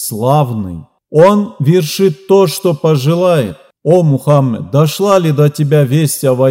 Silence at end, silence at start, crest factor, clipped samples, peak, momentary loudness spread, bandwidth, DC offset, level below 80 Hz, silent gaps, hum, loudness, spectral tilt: 0 s; 0 s; 10 dB; 0.3%; 0 dBFS; 7 LU; 16.5 kHz; under 0.1%; -54 dBFS; none; none; -11 LUFS; -6.5 dB/octave